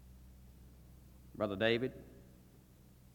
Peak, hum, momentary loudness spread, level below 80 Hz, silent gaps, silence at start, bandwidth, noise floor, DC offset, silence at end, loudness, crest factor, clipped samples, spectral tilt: -18 dBFS; none; 27 LU; -62 dBFS; none; 0 s; 19 kHz; -61 dBFS; under 0.1%; 0.9 s; -36 LUFS; 24 dB; under 0.1%; -6.5 dB/octave